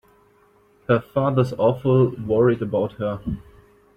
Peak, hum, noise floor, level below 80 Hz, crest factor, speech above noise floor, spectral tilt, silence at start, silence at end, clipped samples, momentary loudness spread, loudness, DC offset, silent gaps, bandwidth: -4 dBFS; none; -57 dBFS; -48 dBFS; 18 dB; 37 dB; -9.5 dB/octave; 0.9 s; 0.55 s; under 0.1%; 12 LU; -21 LUFS; under 0.1%; none; 6.6 kHz